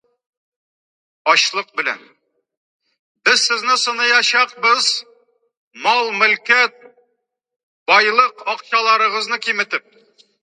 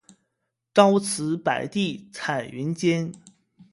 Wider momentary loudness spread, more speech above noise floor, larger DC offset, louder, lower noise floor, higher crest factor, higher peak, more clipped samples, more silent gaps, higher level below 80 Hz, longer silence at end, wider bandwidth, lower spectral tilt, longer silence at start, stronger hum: about the same, 10 LU vs 11 LU; about the same, 56 dB vs 56 dB; neither; first, -15 LUFS vs -24 LUFS; second, -72 dBFS vs -79 dBFS; about the same, 18 dB vs 22 dB; about the same, 0 dBFS vs -2 dBFS; neither; first, 2.57-2.80 s, 2.99-3.15 s, 5.57-5.71 s, 7.63-7.86 s vs none; second, -80 dBFS vs -66 dBFS; first, 0.65 s vs 0.1 s; about the same, 11.5 kHz vs 11.5 kHz; second, 0.5 dB/octave vs -5 dB/octave; first, 1.25 s vs 0.75 s; neither